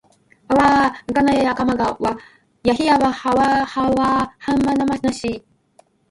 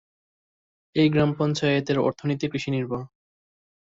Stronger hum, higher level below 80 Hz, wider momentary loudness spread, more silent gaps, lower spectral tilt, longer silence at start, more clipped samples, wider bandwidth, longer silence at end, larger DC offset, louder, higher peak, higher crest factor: neither; first, -44 dBFS vs -58 dBFS; about the same, 9 LU vs 10 LU; neither; about the same, -5.5 dB/octave vs -6.5 dB/octave; second, 0.5 s vs 0.95 s; neither; first, 11.5 kHz vs 7.8 kHz; second, 0.7 s vs 0.9 s; neither; first, -18 LUFS vs -24 LUFS; first, -2 dBFS vs -8 dBFS; about the same, 16 dB vs 18 dB